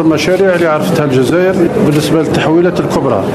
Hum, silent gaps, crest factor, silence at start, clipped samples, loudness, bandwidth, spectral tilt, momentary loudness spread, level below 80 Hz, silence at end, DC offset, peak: none; none; 10 dB; 0 s; under 0.1%; -11 LUFS; 14.5 kHz; -6.5 dB/octave; 2 LU; -40 dBFS; 0 s; under 0.1%; 0 dBFS